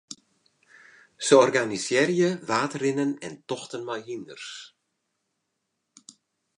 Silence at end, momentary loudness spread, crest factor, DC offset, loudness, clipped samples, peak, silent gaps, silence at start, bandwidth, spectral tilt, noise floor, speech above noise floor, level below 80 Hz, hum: 1.9 s; 20 LU; 22 dB; under 0.1%; -24 LUFS; under 0.1%; -4 dBFS; none; 0.1 s; 11 kHz; -4 dB/octave; -79 dBFS; 55 dB; -76 dBFS; none